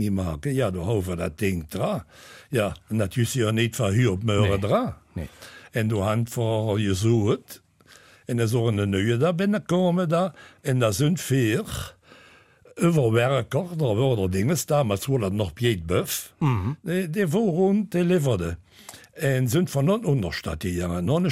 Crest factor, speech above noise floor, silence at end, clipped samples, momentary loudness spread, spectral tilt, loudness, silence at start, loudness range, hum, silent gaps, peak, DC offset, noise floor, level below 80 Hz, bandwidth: 16 dB; 30 dB; 0 s; under 0.1%; 9 LU; -6 dB/octave; -24 LUFS; 0 s; 2 LU; none; none; -8 dBFS; under 0.1%; -53 dBFS; -48 dBFS; 16 kHz